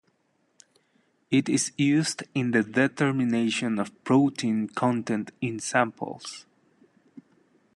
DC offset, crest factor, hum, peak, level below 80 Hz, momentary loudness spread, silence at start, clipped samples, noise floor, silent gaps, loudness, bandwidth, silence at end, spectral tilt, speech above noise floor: under 0.1%; 20 dB; none; -6 dBFS; -72 dBFS; 9 LU; 1.3 s; under 0.1%; -70 dBFS; none; -26 LUFS; 12 kHz; 1.35 s; -5 dB/octave; 45 dB